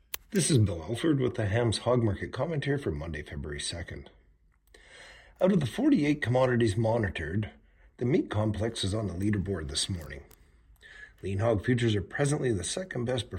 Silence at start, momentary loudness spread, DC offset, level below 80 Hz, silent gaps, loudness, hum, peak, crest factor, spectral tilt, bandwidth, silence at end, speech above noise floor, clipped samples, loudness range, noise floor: 0.15 s; 13 LU; under 0.1%; -50 dBFS; none; -29 LUFS; none; -12 dBFS; 18 dB; -5.5 dB/octave; 16 kHz; 0 s; 35 dB; under 0.1%; 5 LU; -64 dBFS